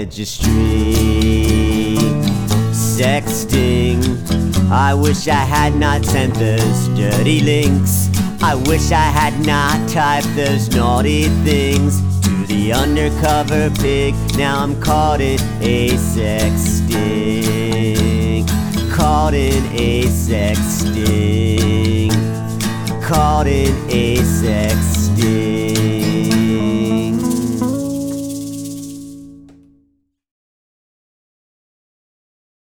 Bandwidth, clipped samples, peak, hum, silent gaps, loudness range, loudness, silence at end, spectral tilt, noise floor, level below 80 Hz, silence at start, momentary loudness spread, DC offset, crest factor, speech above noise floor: over 20 kHz; under 0.1%; -2 dBFS; none; none; 3 LU; -15 LUFS; 3.3 s; -5.5 dB/octave; -62 dBFS; -24 dBFS; 0 s; 4 LU; under 0.1%; 14 dB; 48 dB